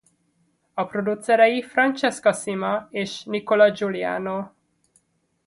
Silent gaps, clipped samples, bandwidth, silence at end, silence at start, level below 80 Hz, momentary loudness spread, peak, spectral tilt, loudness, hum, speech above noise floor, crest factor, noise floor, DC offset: none; under 0.1%; 11.5 kHz; 1 s; 0.75 s; -68 dBFS; 12 LU; -4 dBFS; -4.5 dB/octave; -22 LUFS; none; 46 dB; 20 dB; -67 dBFS; under 0.1%